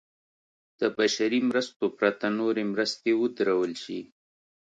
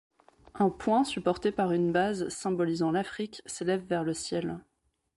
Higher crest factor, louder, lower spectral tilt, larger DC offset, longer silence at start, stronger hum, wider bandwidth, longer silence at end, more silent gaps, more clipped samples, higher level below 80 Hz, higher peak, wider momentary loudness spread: about the same, 20 dB vs 18 dB; first, -27 LUFS vs -30 LUFS; second, -4 dB/octave vs -5.5 dB/octave; neither; first, 0.8 s vs 0.55 s; neither; second, 9.2 kHz vs 11.5 kHz; first, 0.7 s vs 0.55 s; first, 1.76-1.80 s vs none; neither; second, -76 dBFS vs -62 dBFS; first, -8 dBFS vs -12 dBFS; second, 6 LU vs 9 LU